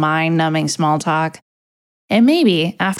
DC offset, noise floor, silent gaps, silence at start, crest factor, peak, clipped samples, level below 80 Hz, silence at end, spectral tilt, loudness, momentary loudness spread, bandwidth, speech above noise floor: under 0.1%; under -90 dBFS; 1.42-2.08 s; 0 s; 14 dB; -2 dBFS; under 0.1%; -66 dBFS; 0 s; -5 dB/octave; -16 LUFS; 7 LU; 14 kHz; over 75 dB